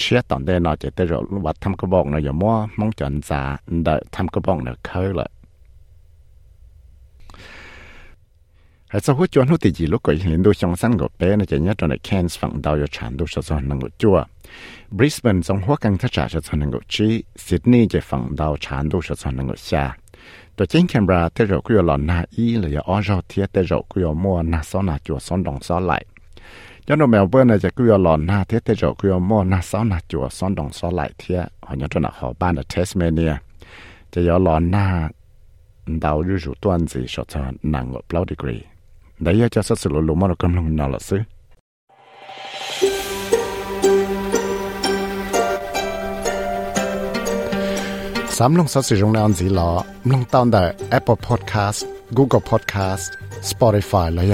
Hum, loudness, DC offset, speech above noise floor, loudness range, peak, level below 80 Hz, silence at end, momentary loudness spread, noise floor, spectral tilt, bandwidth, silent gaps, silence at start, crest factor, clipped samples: none; -20 LUFS; under 0.1%; 34 dB; 6 LU; -2 dBFS; -36 dBFS; 0 s; 10 LU; -52 dBFS; -6.5 dB/octave; 16.5 kHz; 41.60-41.88 s; 0 s; 18 dB; under 0.1%